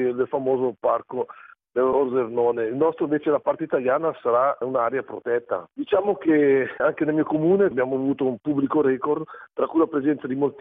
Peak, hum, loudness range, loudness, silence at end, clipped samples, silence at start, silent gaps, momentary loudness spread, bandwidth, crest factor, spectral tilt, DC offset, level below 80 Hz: -6 dBFS; none; 2 LU; -23 LUFS; 0 s; under 0.1%; 0 s; none; 7 LU; 3.8 kHz; 16 dB; -10.5 dB/octave; under 0.1%; -66 dBFS